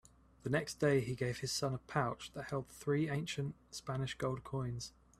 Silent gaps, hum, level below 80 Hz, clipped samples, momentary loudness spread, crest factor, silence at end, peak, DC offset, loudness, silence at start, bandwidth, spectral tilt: none; none; -64 dBFS; under 0.1%; 10 LU; 20 dB; 0.3 s; -20 dBFS; under 0.1%; -38 LUFS; 0.45 s; 14 kHz; -5.5 dB/octave